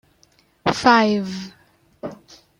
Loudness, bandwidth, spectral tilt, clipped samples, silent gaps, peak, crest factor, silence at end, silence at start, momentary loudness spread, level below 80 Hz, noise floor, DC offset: -18 LUFS; 11 kHz; -5 dB/octave; under 0.1%; none; -2 dBFS; 20 dB; 0.45 s; 0.65 s; 21 LU; -56 dBFS; -59 dBFS; under 0.1%